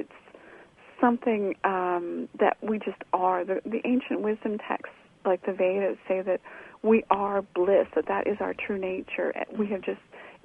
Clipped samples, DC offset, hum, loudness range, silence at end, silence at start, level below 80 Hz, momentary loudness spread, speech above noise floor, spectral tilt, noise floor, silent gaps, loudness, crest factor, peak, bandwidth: under 0.1%; under 0.1%; none; 2 LU; 0.1 s; 0 s; -66 dBFS; 9 LU; 25 dB; -8 dB/octave; -52 dBFS; none; -28 LUFS; 24 dB; -4 dBFS; 3.8 kHz